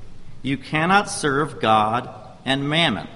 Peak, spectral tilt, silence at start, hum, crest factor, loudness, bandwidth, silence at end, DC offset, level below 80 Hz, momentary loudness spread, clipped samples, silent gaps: -2 dBFS; -4.5 dB/octave; 0 s; none; 20 dB; -20 LUFS; 11.5 kHz; 0 s; under 0.1%; -46 dBFS; 11 LU; under 0.1%; none